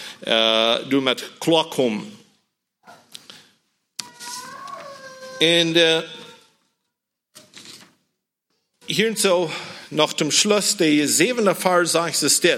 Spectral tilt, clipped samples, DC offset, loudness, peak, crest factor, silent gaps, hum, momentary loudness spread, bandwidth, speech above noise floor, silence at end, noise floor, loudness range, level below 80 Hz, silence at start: -2.5 dB/octave; under 0.1%; under 0.1%; -18 LUFS; -2 dBFS; 20 dB; none; none; 21 LU; 16.5 kHz; 61 dB; 0 s; -80 dBFS; 12 LU; -74 dBFS; 0 s